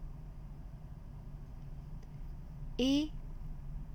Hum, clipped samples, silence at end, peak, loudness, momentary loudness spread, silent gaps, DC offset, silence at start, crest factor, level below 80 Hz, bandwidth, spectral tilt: none; under 0.1%; 0 s; -20 dBFS; -41 LUFS; 18 LU; none; under 0.1%; 0 s; 20 dB; -46 dBFS; 15.5 kHz; -6 dB/octave